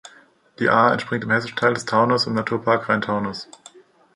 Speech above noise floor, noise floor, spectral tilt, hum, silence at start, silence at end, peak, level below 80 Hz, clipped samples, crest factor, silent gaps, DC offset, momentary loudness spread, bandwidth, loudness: 32 dB; -52 dBFS; -5.5 dB/octave; none; 0.05 s; 0.7 s; -2 dBFS; -60 dBFS; under 0.1%; 20 dB; none; under 0.1%; 8 LU; 11 kHz; -20 LUFS